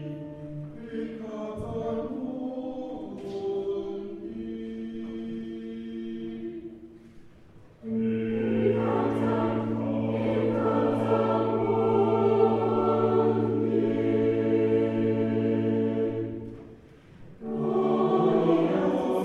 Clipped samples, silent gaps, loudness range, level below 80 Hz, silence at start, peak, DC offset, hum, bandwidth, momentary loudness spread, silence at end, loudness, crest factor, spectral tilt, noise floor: under 0.1%; none; 11 LU; -58 dBFS; 0 s; -10 dBFS; under 0.1%; none; 6.8 kHz; 14 LU; 0 s; -27 LUFS; 18 dB; -9 dB/octave; -51 dBFS